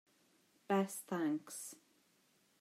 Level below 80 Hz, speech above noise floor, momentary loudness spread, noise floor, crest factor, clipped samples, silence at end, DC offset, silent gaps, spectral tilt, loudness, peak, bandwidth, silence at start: under -90 dBFS; 35 dB; 13 LU; -74 dBFS; 18 dB; under 0.1%; 0.85 s; under 0.1%; none; -5 dB/octave; -39 LUFS; -24 dBFS; 16 kHz; 0.7 s